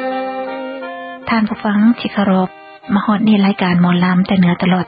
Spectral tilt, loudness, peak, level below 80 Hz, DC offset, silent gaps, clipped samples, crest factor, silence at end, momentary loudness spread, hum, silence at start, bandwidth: -11 dB/octave; -15 LUFS; -2 dBFS; -50 dBFS; under 0.1%; none; under 0.1%; 12 dB; 0 s; 13 LU; none; 0 s; 5 kHz